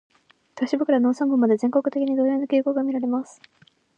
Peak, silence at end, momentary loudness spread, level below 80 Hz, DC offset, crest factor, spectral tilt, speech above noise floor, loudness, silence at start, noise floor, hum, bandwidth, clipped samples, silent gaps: -8 dBFS; 0.75 s; 7 LU; -78 dBFS; under 0.1%; 16 dB; -6.5 dB/octave; 26 dB; -22 LUFS; 0.55 s; -47 dBFS; none; 8.8 kHz; under 0.1%; none